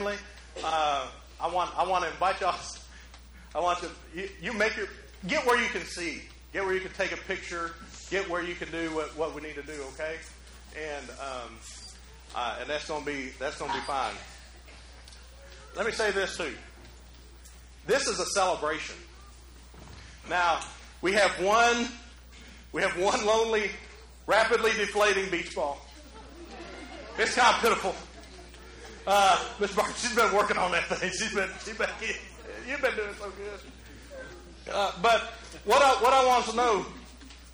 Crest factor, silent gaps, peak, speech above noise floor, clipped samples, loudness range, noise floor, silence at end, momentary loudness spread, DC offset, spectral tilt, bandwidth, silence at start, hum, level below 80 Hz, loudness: 20 dB; none; -10 dBFS; 22 dB; under 0.1%; 8 LU; -50 dBFS; 0 s; 23 LU; under 0.1%; -2.5 dB/octave; over 20 kHz; 0 s; none; -50 dBFS; -28 LUFS